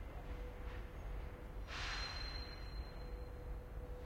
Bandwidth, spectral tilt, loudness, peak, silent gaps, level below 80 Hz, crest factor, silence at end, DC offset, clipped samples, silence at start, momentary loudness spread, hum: 16 kHz; -4.5 dB/octave; -48 LUFS; -32 dBFS; none; -48 dBFS; 14 dB; 0 s; under 0.1%; under 0.1%; 0 s; 8 LU; none